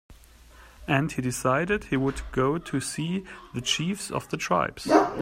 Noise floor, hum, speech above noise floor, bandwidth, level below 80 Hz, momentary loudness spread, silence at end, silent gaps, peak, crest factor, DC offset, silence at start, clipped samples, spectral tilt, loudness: -51 dBFS; none; 25 dB; 16 kHz; -48 dBFS; 9 LU; 0 s; none; -6 dBFS; 22 dB; under 0.1%; 0.1 s; under 0.1%; -4.5 dB/octave; -27 LUFS